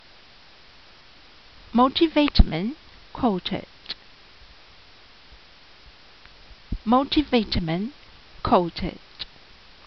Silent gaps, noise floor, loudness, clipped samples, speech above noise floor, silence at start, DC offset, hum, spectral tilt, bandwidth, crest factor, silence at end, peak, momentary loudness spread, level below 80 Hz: none; -51 dBFS; -24 LUFS; under 0.1%; 30 dB; 1.75 s; 0.2%; none; -4.5 dB/octave; 6.2 kHz; 22 dB; 0.6 s; -4 dBFS; 18 LU; -32 dBFS